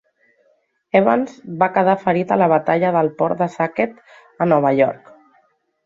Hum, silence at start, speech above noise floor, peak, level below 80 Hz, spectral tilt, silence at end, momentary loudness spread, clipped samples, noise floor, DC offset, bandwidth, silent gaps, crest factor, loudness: none; 0.95 s; 45 dB; -2 dBFS; -62 dBFS; -8.5 dB/octave; 0.9 s; 7 LU; under 0.1%; -62 dBFS; under 0.1%; 7.6 kHz; none; 18 dB; -18 LUFS